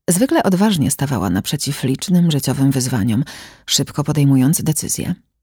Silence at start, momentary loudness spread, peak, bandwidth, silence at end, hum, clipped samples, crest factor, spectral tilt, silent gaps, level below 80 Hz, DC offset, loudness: 0.1 s; 7 LU; -2 dBFS; over 20 kHz; 0.3 s; none; under 0.1%; 16 dB; -5 dB/octave; none; -48 dBFS; under 0.1%; -17 LUFS